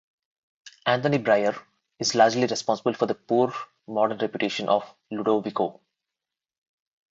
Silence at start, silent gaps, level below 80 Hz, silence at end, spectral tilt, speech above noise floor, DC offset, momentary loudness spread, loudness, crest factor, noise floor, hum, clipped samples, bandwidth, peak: 0.65 s; none; -72 dBFS; 1.4 s; -4.5 dB/octave; 64 dB; under 0.1%; 9 LU; -25 LUFS; 22 dB; -88 dBFS; none; under 0.1%; 8 kHz; -4 dBFS